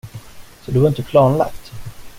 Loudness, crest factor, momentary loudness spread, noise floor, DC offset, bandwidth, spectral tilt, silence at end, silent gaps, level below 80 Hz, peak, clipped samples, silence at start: -16 LUFS; 16 dB; 23 LU; -37 dBFS; under 0.1%; 16 kHz; -8 dB/octave; 0 s; none; -42 dBFS; -2 dBFS; under 0.1%; 0.05 s